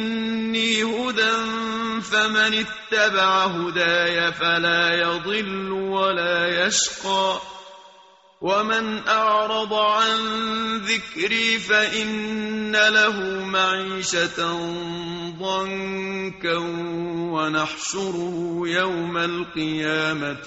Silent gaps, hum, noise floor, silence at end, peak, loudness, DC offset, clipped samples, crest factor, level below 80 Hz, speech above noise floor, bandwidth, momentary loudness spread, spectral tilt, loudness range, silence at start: none; none; -52 dBFS; 0 s; -4 dBFS; -21 LUFS; under 0.1%; under 0.1%; 18 dB; -58 dBFS; 29 dB; 8 kHz; 9 LU; -1 dB/octave; 6 LU; 0 s